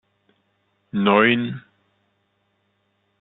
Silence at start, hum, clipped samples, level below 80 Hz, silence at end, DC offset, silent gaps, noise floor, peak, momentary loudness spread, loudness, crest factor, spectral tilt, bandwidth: 0.95 s; none; under 0.1%; -68 dBFS; 1.6 s; under 0.1%; none; -69 dBFS; -2 dBFS; 15 LU; -19 LUFS; 22 dB; -10 dB/octave; 4.1 kHz